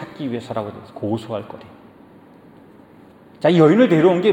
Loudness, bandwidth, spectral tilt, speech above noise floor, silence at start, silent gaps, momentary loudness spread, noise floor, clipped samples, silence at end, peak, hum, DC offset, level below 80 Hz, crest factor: -18 LUFS; 10 kHz; -8 dB/octave; 29 dB; 0 s; none; 18 LU; -46 dBFS; under 0.1%; 0 s; -2 dBFS; none; under 0.1%; -64 dBFS; 18 dB